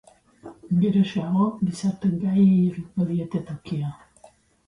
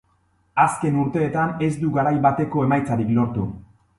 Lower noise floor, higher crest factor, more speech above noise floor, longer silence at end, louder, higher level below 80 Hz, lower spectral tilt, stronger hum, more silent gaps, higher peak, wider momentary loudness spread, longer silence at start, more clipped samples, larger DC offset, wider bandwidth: second, -55 dBFS vs -63 dBFS; second, 14 dB vs 20 dB; second, 32 dB vs 43 dB; first, 0.75 s vs 0.4 s; about the same, -23 LUFS vs -21 LUFS; second, -58 dBFS vs -50 dBFS; about the same, -8.5 dB/octave vs -8 dB/octave; neither; neither; second, -10 dBFS vs -2 dBFS; first, 12 LU vs 8 LU; about the same, 0.45 s vs 0.55 s; neither; neither; about the same, 10.5 kHz vs 11.5 kHz